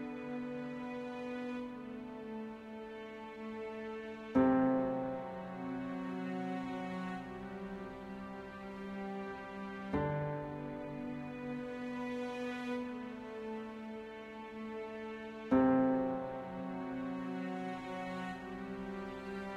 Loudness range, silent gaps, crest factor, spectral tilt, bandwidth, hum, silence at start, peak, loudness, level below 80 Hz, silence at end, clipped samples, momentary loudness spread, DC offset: 8 LU; none; 20 dB; -7.5 dB/octave; 8.2 kHz; none; 0 s; -18 dBFS; -40 LUFS; -64 dBFS; 0 s; under 0.1%; 14 LU; under 0.1%